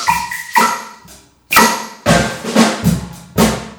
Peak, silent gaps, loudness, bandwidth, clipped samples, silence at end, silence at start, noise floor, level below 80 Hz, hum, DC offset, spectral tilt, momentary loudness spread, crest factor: 0 dBFS; none; -14 LUFS; over 20 kHz; under 0.1%; 0.05 s; 0 s; -42 dBFS; -34 dBFS; none; under 0.1%; -4 dB/octave; 12 LU; 16 dB